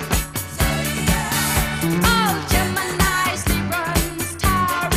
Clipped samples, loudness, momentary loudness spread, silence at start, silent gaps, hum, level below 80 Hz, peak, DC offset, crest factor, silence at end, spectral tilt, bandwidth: under 0.1%; -20 LUFS; 5 LU; 0 s; none; none; -28 dBFS; -2 dBFS; under 0.1%; 18 dB; 0 s; -3.5 dB/octave; 16 kHz